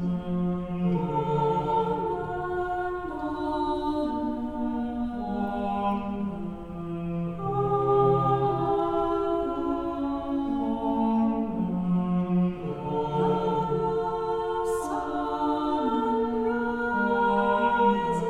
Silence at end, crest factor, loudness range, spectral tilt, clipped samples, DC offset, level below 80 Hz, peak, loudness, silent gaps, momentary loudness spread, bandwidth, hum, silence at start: 0 s; 16 dB; 4 LU; -8 dB/octave; under 0.1%; under 0.1%; -48 dBFS; -10 dBFS; -27 LUFS; none; 8 LU; 12 kHz; none; 0 s